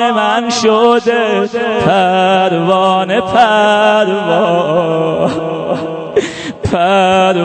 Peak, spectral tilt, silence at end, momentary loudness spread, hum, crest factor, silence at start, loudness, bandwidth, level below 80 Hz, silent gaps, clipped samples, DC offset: 0 dBFS; -5 dB/octave; 0 s; 8 LU; none; 12 dB; 0 s; -12 LUFS; 9 kHz; -46 dBFS; none; under 0.1%; under 0.1%